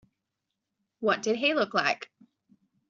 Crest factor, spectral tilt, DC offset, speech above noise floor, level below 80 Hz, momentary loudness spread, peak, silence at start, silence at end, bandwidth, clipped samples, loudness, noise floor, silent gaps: 22 dB; -1 dB/octave; under 0.1%; 58 dB; -74 dBFS; 9 LU; -10 dBFS; 1 s; 0.85 s; 7.4 kHz; under 0.1%; -27 LUFS; -85 dBFS; none